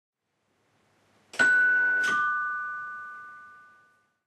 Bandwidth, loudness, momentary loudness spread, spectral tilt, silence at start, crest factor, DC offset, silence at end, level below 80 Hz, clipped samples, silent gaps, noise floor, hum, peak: 12.5 kHz; -24 LUFS; 21 LU; -1 dB/octave; 1.35 s; 18 dB; under 0.1%; 0.75 s; -82 dBFS; under 0.1%; none; -75 dBFS; none; -12 dBFS